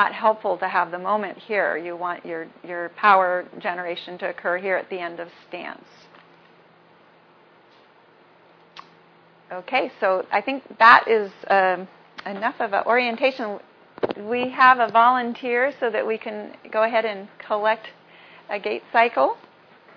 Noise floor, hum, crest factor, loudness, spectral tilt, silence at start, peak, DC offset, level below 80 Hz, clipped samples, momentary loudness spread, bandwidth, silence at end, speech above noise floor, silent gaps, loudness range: -54 dBFS; none; 22 dB; -21 LUFS; -5.5 dB/octave; 0 s; 0 dBFS; under 0.1%; -76 dBFS; under 0.1%; 18 LU; 5.4 kHz; 0.6 s; 32 dB; none; 11 LU